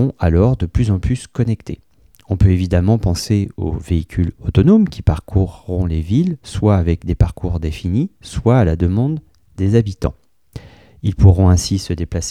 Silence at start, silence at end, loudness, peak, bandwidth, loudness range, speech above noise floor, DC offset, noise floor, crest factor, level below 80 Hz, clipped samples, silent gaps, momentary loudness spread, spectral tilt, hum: 0 s; 0 s; -17 LUFS; 0 dBFS; 12.5 kHz; 2 LU; 22 dB; 0.2%; -37 dBFS; 16 dB; -28 dBFS; under 0.1%; none; 11 LU; -7.5 dB/octave; none